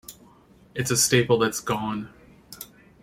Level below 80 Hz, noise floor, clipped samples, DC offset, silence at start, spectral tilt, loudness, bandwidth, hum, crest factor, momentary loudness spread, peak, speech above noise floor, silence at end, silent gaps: -56 dBFS; -54 dBFS; under 0.1%; under 0.1%; 0.1 s; -3.5 dB/octave; -23 LUFS; 16.5 kHz; none; 20 dB; 23 LU; -6 dBFS; 31 dB; 0.4 s; none